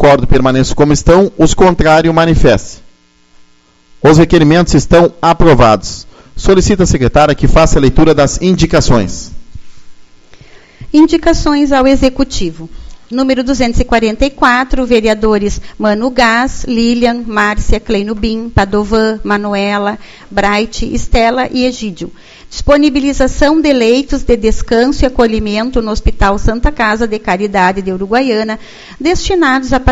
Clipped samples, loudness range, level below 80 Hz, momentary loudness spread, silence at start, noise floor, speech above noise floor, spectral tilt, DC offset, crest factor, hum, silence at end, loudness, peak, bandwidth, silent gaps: 0.9%; 4 LU; -20 dBFS; 9 LU; 0 s; -45 dBFS; 36 dB; -5.5 dB/octave; under 0.1%; 10 dB; none; 0 s; -10 LUFS; 0 dBFS; 8 kHz; none